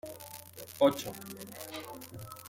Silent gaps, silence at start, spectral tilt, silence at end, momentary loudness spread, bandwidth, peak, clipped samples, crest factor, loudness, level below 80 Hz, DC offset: none; 0.05 s; -4.5 dB/octave; 0 s; 18 LU; 17 kHz; -12 dBFS; under 0.1%; 24 dB; -34 LUFS; -72 dBFS; under 0.1%